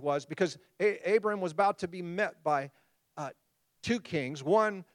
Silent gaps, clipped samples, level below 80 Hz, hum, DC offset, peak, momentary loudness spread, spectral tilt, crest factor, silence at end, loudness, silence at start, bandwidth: none; under 0.1%; -72 dBFS; none; under 0.1%; -14 dBFS; 15 LU; -5.5 dB/octave; 18 dB; 0.1 s; -31 LUFS; 0 s; 11.5 kHz